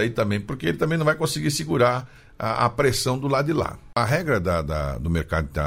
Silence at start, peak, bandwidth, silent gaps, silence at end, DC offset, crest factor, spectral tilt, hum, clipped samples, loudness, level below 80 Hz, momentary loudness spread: 0 s; -6 dBFS; 16 kHz; none; 0 s; under 0.1%; 18 dB; -5.5 dB/octave; none; under 0.1%; -23 LUFS; -38 dBFS; 6 LU